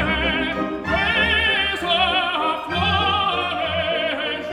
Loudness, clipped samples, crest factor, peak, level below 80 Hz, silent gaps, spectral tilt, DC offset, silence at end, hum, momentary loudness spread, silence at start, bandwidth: -19 LUFS; under 0.1%; 14 dB; -6 dBFS; -38 dBFS; none; -5 dB/octave; under 0.1%; 0 s; none; 6 LU; 0 s; 15.5 kHz